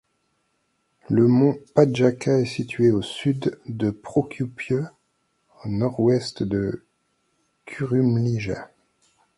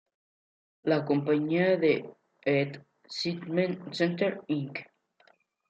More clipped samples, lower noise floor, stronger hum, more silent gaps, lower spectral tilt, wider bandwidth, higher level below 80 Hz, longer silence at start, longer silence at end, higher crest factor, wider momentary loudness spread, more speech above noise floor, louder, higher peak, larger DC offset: neither; first, -71 dBFS vs -65 dBFS; neither; neither; about the same, -7.5 dB/octave vs -7 dB/octave; first, 11.5 kHz vs 8.6 kHz; first, -54 dBFS vs -78 dBFS; first, 1.1 s vs 0.85 s; second, 0.7 s vs 0.85 s; about the same, 22 dB vs 18 dB; about the same, 12 LU vs 13 LU; first, 49 dB vs 37 dB; first, -23 LUFS vs -29 LUFS; first, -2 dBFS vs -12 dBFS; neither